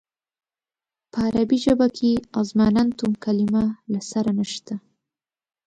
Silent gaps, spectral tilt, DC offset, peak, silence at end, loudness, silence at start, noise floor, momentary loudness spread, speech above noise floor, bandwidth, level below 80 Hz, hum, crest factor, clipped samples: none; -6.5 dB/octave; under 0.1%; -8 dBFS; 0.9 s; -22 LUFS; 1.15 s; under -90 dBFS; 10 LU; over 69 dB; 9.2 kHz; -50 dBFS; none; 16 dB; under 0.1%